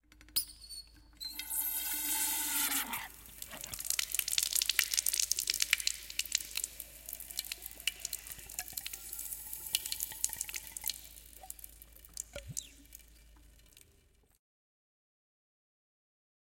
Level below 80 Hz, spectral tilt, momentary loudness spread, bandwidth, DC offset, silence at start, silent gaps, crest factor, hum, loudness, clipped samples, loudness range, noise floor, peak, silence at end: -62 dBFS; 1.5 dB/octave; 18 LU; 17 kHz; under 0.1%; 0.15 s; none; 34 dB; none; -34 LUFS; under 0.1%; 17 LU; -67 dBFS; -6 dBFS; 2.8 s